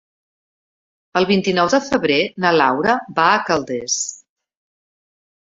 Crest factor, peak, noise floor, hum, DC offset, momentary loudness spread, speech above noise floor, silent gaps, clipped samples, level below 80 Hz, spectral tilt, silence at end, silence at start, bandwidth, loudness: 18 dB; -2 dBFS; under -90 dBFS; none; under 0.1%; 6 LU; over 73 dB; none; under 0.1%; -58 dBFS; -3.5 dB/octave; 1.35 s; 1.15 s; 8 kHz; -17 LUFS